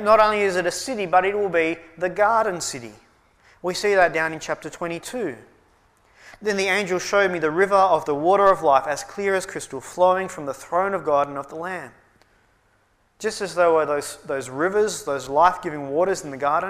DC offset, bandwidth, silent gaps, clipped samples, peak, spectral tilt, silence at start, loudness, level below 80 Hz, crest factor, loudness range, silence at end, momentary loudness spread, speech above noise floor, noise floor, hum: under 0.1%; 15.5 kHz; none; under 0.1%; -4 dBFS; -4 dB/octave; 0 s; -22 LUFS; -58 dBFS; 18 dB; 6 LU; 0 s; 13 LU; 42 dB; -63 dBFS; none